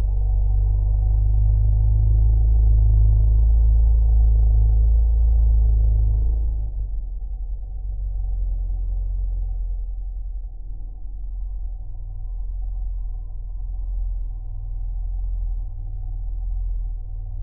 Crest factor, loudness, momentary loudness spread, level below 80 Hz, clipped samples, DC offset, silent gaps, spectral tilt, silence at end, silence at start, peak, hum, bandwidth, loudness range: 12 dB; -23 LUFS; 16 LU; -20 dBFS; under 0.1%; under 0.1%; none; -12.5 dB/octave; 0 s; 0 s; -8 dBFS; none; 1 kHz; 15 LU